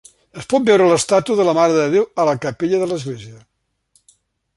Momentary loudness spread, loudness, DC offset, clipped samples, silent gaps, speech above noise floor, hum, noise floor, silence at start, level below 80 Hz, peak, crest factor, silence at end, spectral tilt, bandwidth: 12 LU; -16 LUFS; under 0.1%; under 0.1%; none; 45 dB; none; -61 dBFS; 0.35 s; -58 dBFS; -2 dBFS; 16 dB; 1.2 s; -5 dB/octave; 11.5 kHz